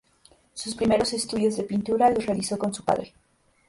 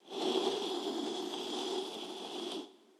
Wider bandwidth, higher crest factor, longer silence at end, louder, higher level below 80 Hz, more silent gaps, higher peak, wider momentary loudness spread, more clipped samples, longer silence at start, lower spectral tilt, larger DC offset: second, 11.5 kHz vs 14 kHz; about the same, 18 dB vs 20 dB; first, 0.6 s vs 0.25 s; first, -25 LUFS vs -37 LUFS; first, -56 dBFS vs under -90 dBFS; neither; first, -8 dBFS vs -18 dBFS; first, 13 LU vs 9 LU; neither; first, 0.55 s vs 0.05 s; first, -4.5 dB/octave vs -2.5 dB/octave; neither